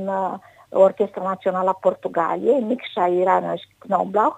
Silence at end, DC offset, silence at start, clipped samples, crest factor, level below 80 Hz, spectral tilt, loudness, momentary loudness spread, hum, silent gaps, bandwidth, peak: 0 s; under 0.1%; 0 s; under 0.1%; 18 dB; -70 dBFS; -7.5 dB/octave; -21 LUFS; 9 LU; none; none; 8.6 kHz; -4 dBFS